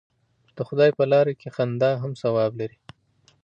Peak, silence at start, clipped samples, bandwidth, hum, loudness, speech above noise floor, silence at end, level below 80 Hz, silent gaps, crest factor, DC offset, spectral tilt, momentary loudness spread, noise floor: -8 dBFS; 0.55 s; under 0.1%; 8.2 kHz; none; -23 LUFS; 40 dB; 0.75 s; -68 dBFS; none; 16 dB; under 0.1%; -8 dB/octave; 13 LU; -62 dBFS